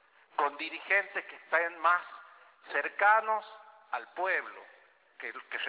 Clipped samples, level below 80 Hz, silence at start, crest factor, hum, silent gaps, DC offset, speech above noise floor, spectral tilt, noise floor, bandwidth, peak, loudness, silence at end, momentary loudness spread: under 0.1%; under -90 dBFS; 0.4 s; 20 dB; none; none; under 0.1%; 23 dB; 3 dB/octave; -55 dBFS; 4 kHz; -12 dBFS; -30 LUFS; 0 s; 18 LU